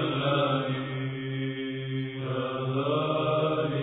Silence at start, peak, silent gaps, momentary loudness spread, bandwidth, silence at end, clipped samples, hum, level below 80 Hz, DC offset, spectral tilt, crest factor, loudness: 0 s; -14 dBFS; none; 7 LU; 4 kHz; 0 s; under 0.1%; none; -66 dBFS; under 0.1%; -10.5 dB/octave; 14 dB; -29 LUFS